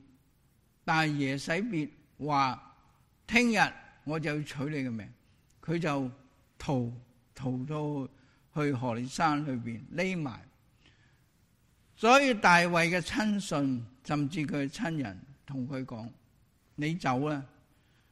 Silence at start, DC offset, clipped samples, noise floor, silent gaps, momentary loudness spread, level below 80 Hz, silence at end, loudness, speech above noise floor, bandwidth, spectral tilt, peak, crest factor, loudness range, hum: 0.85 s; under 0.1%; under 0.1%; -68 dBFS; none; 18 LU; -62 dBFS; 0.65 s; -30 LUFS; 38 dB; 13.5 kHz; -5 dB/octave; -10 dBFS; 22 dB; 9 LU; none